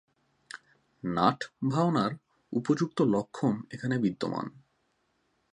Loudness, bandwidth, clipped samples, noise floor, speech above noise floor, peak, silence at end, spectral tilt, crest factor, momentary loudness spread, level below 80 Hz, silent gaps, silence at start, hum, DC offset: -30 LUFS; 11 kHz; under 0.1%; -74 dBFS; 45 dB; -8 dBFS; 1.05 s; -7 dB/octave; 24 dB; 19 LU; -68 dBFS; none; 1.05 s; none; under 0.1%